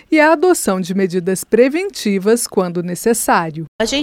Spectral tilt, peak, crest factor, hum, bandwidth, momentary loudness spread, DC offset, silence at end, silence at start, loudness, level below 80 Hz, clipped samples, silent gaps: -4.5 dB/octave; 0 dBFS; 14 dB; none; 17 kHz; 7 LU; under 0.1%; 0 s; 0.1 s; -16 LUFS; -50 dBFS; under 0.1%; 3.68-3.79 s